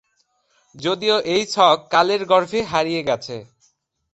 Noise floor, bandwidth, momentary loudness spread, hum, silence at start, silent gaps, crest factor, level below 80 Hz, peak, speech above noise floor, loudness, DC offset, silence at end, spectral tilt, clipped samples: -66 dBFS; 8.2 kHz; 10 LU; none; 0.75 s; none; 18 dB; -58 dBFS; -2 dBFS; 47 dB; -19 LUFS; under 0.1%; 0.7 s; -4 dB/octave; under 0.1%